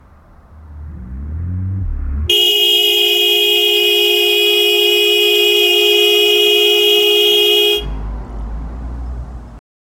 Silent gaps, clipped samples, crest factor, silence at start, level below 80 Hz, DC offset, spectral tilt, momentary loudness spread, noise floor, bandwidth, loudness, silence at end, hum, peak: none; under 0.1%; 14 dB; 0.55 s; -28 dBFS; under 0.1%; -2.5 dB/octave; 18 LU; -43 dBFS; 17 kHz; -10 LUFS; 0.4 s; none; 0 dBFS